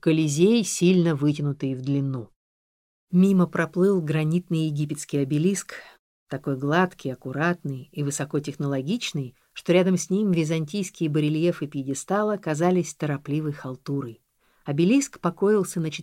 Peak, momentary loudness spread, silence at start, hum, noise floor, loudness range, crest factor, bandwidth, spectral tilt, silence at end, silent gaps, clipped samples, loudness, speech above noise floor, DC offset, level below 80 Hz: -8 dBFS; 11 LU; 0.05 s; none; under -90 dBFS; 3 LU; 16 dB; 15.5 kHz; -6 dB/octave; 0 s; 2.36-3.07 s, 5.99-6.26 s; under 0.1%; -24 LUFS; over 66 dB; under 0.1%; -66 dBFS